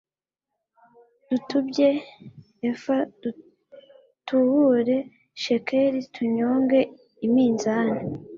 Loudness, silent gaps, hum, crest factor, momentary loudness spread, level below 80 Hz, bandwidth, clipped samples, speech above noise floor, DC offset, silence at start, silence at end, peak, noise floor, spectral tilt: -24 LUFS; none; none; 16 dB; 11 LU; -66 dBFS; 7.4 kHz; under 0.1%; 64 dB; under 0.1%; 1.3 s; 0 s; -8 dBFS; -86 dBFS; -6 dB/octave